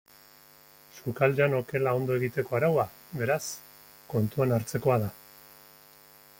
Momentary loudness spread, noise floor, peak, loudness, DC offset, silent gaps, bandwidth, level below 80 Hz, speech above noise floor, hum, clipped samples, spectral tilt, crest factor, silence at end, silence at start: 12 LU; -55 dBFS; -10 dBFS; -28 LUFS; under 0.1%; none; 17 kHz; -64 dBFS; 28 dB; none; under 0.1%; -6.5 dB/octave; 18 dB; 1.25 s; 0.95 s